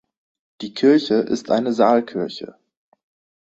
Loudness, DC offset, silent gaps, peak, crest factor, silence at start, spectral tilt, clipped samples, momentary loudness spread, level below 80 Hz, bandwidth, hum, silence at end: -19 LUFS; under 0.1%; none; -2 dBFS; 18 dB; 0.6 s; -6 dB/octave; under 0.1%; 18 LU; -64 dBFS; 8 kHz; none; 0.9 s